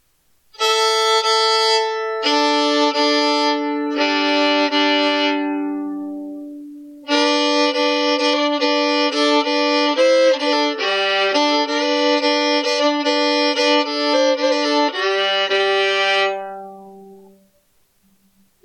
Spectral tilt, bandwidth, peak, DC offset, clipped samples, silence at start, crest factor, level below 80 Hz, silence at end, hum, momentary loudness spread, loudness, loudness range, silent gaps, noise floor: -1 dB/octave; 14 kHz; -6 dBFS; under 0.1%; under 0.1%; 0.6 s; 12 dB; -76 dBFS; 1.5 s; none; 8 LU; -16 LUFS; 3 LU; none; -61 dBFS